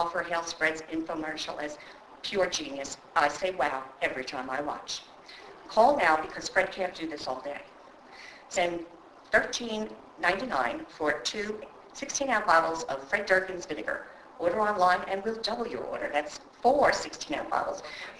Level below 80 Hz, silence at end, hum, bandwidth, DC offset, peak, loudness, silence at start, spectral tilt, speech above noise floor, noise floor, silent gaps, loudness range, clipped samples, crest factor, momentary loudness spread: -62 dBFS; 0 s; none; 11 kHz; under 0.1%; -6 dBFS; -29 LUFS; 0 s; -2.5 dB/octave; 21 dB; -51 dBFS; none; 4 LU; under 0.1%; 24 dB; 16 LU